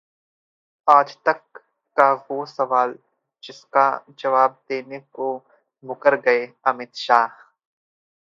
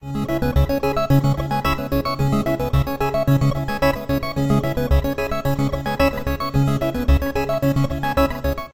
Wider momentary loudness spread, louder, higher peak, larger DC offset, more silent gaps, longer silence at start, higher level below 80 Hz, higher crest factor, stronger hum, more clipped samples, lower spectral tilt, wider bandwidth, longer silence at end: first, 13 LU vs 4 LU; about the same, -20 LUFS vs -20 LUFS; first, 0 dBFS vs -4 dBFS; neither; neither; first, 0.85 s vs 0 s; second, -80 dBFS vs -26 dBFS; first, 22 dB vs 14 dB; neither; neither; second, -4.5 dB/octave vs -7 dB/octave; second, 7.6 kHz vs 16.5 kHz; first, 0.95 s vs 0.05 s